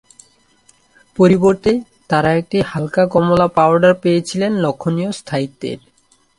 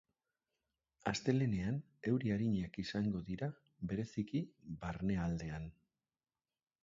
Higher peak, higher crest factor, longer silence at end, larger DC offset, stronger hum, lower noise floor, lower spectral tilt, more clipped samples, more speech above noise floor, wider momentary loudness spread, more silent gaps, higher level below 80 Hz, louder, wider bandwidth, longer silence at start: first, 0 dBFS vs -20 dBFS; about the same, 16 dB vs 20 dB; second, 0.6 s vs 1.1 s; neither; neither; second, -54 dBFS vs under -90 dBFS; about the same, -6.5 dB/octave vs -7 dB/octave; neither; second, 39 dB vs over 52 dB; about the same, 11 LU vs 11 LU; neither; first, -48 dBFS vs -60 dBFS; first, -15 LUFS vs -40 LUFS; first, 11.5 kHz vs 7.6 kHz; first, 1.2 s vs 1.05 s